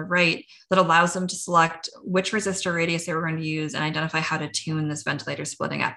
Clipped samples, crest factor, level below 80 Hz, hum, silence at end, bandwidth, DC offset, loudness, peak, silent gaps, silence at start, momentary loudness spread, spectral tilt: under 0.1%; 20 dB; -62 dBFS; none; 0 s; 12.5 kHz; under 0.1%; -24 LUFS; -6 dBFS; none; 0 s; 9 LU; -4 dB/octave